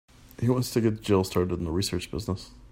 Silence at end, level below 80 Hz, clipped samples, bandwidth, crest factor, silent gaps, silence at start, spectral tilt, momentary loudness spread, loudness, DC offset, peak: 0.05 s; -48 dBFS; under 0.1%; 16 kHz; 18 dB; none; 0.4 s; -6 dB/octave; 8 LU; -28 LUFS; under 0.1%; -10 dBFS